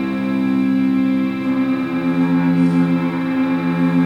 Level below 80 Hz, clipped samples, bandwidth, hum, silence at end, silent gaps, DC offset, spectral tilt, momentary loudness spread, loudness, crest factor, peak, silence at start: -52 dBFS; under 0.1%; 5.6 kHz; none; 0 s; none; under 0.1%; -8.5 dB/octave; 4 LU; -17 LUFS; 12 dB; -6 dBFS; 0 s